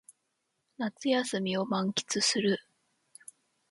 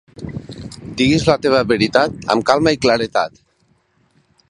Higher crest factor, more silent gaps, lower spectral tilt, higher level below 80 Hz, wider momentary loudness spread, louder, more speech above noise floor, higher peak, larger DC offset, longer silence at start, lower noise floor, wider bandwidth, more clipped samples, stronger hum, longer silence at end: about the same, 18 dB vs 18 dB; neither; second, -3.5 dB/octave vs -5 dB/octave; second, -76 dBFS vs -44 dBFS; first, 20 LU vs 17 LU; second, -30 LUFS vs -16 LUFS; first, 50 dB vs 45 dB; second, -16 dBFS vs 0 dBFS; neither; first, 0.8 s vs 0.2 s; first, -80 dBFS vs -60 dBFS; about the same, 11.5 kHz vs 11.5 kHz; neither; neither; about the same, 1.1 s vs 1.2 s